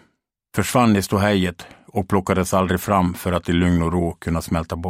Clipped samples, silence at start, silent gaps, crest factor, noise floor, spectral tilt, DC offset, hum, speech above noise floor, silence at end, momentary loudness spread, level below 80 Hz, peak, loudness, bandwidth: under 0.1%; 0.55 s; none; 18 dB; -67 dBFS; -6 dB/octave; under 0.1%; none; 48 dB; 0 s; 8 LU; -40 dBFS; -2 dBFS; -20 LUFS; 16 kHz